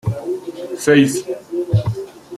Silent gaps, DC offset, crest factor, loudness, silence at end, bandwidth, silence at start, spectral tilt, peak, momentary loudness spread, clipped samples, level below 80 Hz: none; under 0.1%; 16 dB; -18 LUFS; 0 s; 14.5 kHz; 0.05 s; -6 dB/octave; -2 dBFS; 14 LU; under 0.1%; -46 dBFS